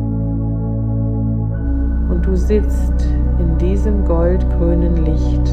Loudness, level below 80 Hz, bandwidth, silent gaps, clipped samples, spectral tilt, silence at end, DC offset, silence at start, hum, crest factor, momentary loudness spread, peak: -17 LUFS; -16 dBFS; 6.4 kHz; none; under 0.1%; -9.5 dB/octave; 0 s; under 0.1%; 0 s; none; 12 dB; 4 LU; -2 dBFS